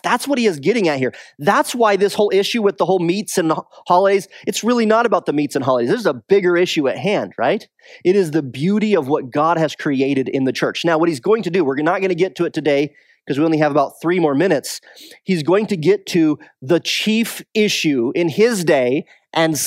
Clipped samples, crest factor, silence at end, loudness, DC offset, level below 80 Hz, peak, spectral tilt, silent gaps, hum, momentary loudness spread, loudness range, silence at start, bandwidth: under 0.1%; 16 dB; 0 s; -17 LUFS; under 0.1%; -70 dBFS; 0 dBFS; -5 dB/octave; none; none; 6 LU; 2 LU; 0.05 s; 16 kHz